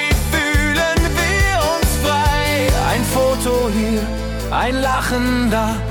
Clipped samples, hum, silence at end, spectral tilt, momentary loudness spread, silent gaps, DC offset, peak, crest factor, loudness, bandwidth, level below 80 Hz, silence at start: under 0.1%; none; 0 s; -4.5 dB/octave; 4 LU; none; under 0.1%; -4 dBFS; 12 dB; -17 LUFS; 18 kHz; -24 dBFS; 0 s